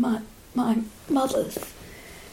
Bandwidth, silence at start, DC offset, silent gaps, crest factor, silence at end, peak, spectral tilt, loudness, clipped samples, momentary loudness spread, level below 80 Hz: 16.5 kHz; 0 s; under 0.1%; none; 16 dB; 0 s; -12 dBFS; -5 dB/octave; -27 LUFS; under 0.1%; 19 LU; -52 dBFS